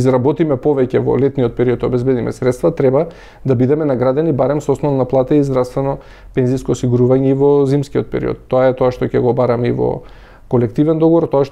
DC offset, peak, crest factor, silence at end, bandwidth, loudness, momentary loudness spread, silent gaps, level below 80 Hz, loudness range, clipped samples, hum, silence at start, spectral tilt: under 0.1%; -4 dBFS; 12 dB; 0 s; 11.5 kHz; -15 LUFS; 7 LU; none; -40 dBFS; 1 LU; under 0.1%; none; 0 s; -8.5 dB/octave